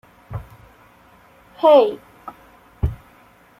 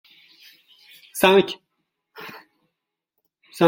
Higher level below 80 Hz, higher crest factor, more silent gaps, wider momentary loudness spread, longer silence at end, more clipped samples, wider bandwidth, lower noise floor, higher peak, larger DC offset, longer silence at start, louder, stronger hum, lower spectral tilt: first, -38 dBFS vs -66 dBFS; about the same, 20 dB vs 24 dB; neither; first, 27 LU vs 24 LU; first, 0.65 s vs 0 s; neither; second, 14 kHz vs 16.5 kHz; second, -51 dBFS vs -81 dBFS; about the same, -2 dBFS vs -2 dBFS; neither; second, 0.3 s vs 1.15 s; about the same, -17 LUFS vs -18 LUFS; first, 60 Hz at -55 dBFS vs none; first, -8 dB/octave vs -4.5 dB/octave